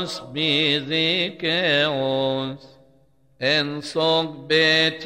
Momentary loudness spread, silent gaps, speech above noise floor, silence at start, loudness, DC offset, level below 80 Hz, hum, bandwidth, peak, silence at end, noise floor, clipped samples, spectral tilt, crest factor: 9 LU; none; 37 dB; 0 s; -20 LUFS; under 0.1%; -62 dBFS; none; 15.5 kHz; -6 dBFS; 0 s; -59 dBFS; under 0.1%; -4.5 dB/octave; 16 dB